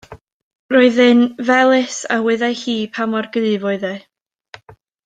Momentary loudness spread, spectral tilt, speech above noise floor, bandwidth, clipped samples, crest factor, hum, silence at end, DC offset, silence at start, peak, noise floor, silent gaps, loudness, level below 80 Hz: 10 LU; -4 dB/octave; 31 dB; 9.2 kHz; under 0.1%; 16 dB; none; 1.05 s; under 0.1%; 0.1 s; -2 dBFS; -47 dBFS; 0.33-0.69 s; -16 LUFS; -62 dBFS